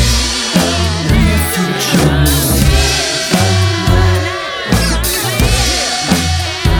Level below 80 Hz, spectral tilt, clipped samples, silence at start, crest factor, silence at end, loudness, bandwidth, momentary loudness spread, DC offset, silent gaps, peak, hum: -18 dBFS; -4 dB/octave; under 0.1%; 0 s; 12 dB; 0 s; -12 LUFS; over 20 kHz; 3 LU; under 0.1%; none; 0 dBFS; none